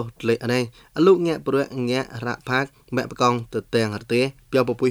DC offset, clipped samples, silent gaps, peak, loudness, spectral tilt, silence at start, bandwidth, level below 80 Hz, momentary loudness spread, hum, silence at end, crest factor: under 0.1%; under 0.1%; none; -4 dBFS; -22 LUFS; -6 dB/octave; 0 s; 19.5 kHz; -56 dBFS; 9 LU; none; 0 s; 18 dB